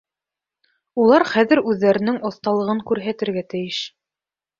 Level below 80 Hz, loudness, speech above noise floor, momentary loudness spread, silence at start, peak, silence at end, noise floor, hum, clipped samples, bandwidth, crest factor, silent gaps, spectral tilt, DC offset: -62 dBFS; -19 LUFS; over 71 dB; 11 LU; 0.95 s; -2 dBFS; 0.7 s; under -90 dBFS; none; under 0.1%; 7.6 kHz; 18 dB; none; -6 dB/octave; under 0.1%